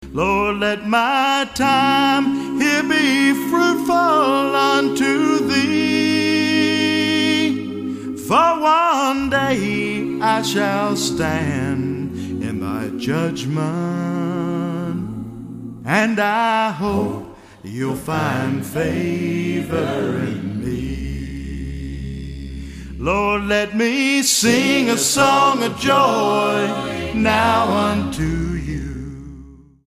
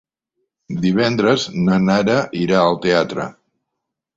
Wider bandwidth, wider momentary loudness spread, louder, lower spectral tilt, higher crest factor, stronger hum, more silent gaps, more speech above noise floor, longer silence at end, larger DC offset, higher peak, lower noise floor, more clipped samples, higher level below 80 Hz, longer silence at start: first, 15.5 kHz vs 7.8 kHz; first, 14 LU vs 9 LU; about the same, -18 LUFS vs -17 LUFS; second, -4.5 dB/octave vs -6 dB/octave; about the same, 18 dB vs 16 dB; neither; neither; second, 24 dB vs 63 dB; second, 0.3 s vs 0.85 s; neither; about the same, -2 dBFS vs -2 dBFS; second, -41 dBFS vs -79 dBFS; neither; first, -38 dBFS vs -52 dBFS; second, 0 s vs 0.7 s